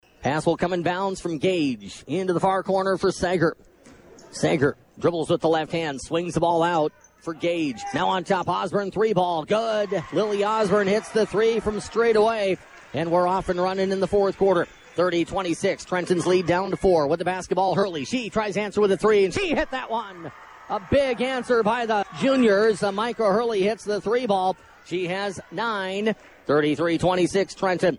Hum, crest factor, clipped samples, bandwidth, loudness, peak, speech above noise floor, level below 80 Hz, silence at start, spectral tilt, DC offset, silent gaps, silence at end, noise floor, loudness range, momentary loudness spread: none; 14 dB; under 0.1%; 11.5 kHz; -23 LUFS; -8 dBFS; 27 dB; -52 dBFS; 0.2 s; -5.5 dB/octave; under 0.1%; none; 0 s; -49 dBFS; 3 LU; 7 LU